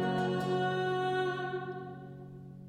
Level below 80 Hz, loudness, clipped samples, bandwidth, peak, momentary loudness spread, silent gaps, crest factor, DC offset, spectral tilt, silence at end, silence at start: -68 dBFS; -33 LUFS; under 0.1%; 12 kHz; -20 dBFS; 16 LU; none; 14 dB; under 0.1%; -6.5 dB/octave; 0 s; 0 s